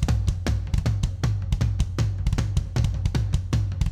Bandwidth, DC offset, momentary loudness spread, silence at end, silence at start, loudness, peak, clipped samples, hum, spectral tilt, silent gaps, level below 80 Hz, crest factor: 13.5 kHz; under 0.1%; 1 LU; 0 s; 0 s; -26 LUFS; -12 dBFS; under 0.1%; none; -6.5 dB/octave; none; -28 dBFS; 12 dB